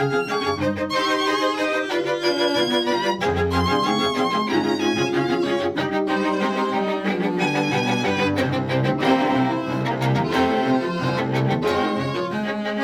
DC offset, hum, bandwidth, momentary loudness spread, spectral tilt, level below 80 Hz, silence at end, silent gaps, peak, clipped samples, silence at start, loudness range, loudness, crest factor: under 0.1%; none; 16 kHz; 3 LU; -5.5 dB/octave; -50 dBFS; 0 s; none; -6 dBFS; under 0.1%; 0 s; 1 LU; -21 LUFS; 16 dB